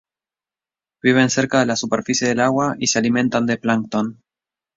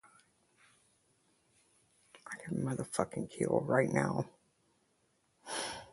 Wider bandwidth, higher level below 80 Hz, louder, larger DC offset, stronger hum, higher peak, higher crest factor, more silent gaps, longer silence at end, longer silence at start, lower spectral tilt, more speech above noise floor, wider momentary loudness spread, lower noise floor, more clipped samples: second, 7.8 kHz vs 11.5 kHz; first, -58 dBFS vs -70 dBFS; first, -18 LUFS vs -35 LUFS; neither; neither; first, -2 dBFS vs -14 dBFS; second, 18 dB vs 26 dB; neither; first, 0.65 s vs 0.05 s; second, 1.05 s vs 2.15 s; second, -4 dB/octave vs -5.5 dB/octave; first, over 72 dB vs 41 dB; second, 5 LU vs 16 LU; first, under -90 dBFS vs -75 dBFS; neither